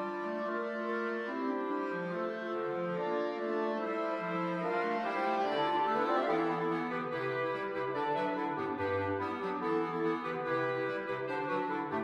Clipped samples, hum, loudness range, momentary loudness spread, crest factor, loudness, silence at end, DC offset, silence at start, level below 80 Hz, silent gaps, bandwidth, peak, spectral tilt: under 0.1%; none; 3 LU; 5 LU; 14 dB; -34 LUFS; 0 s; under 0.1%; 0 s; -80 dBFS; none; 9.8 kHz; -20 dBFS; -7 dB/octave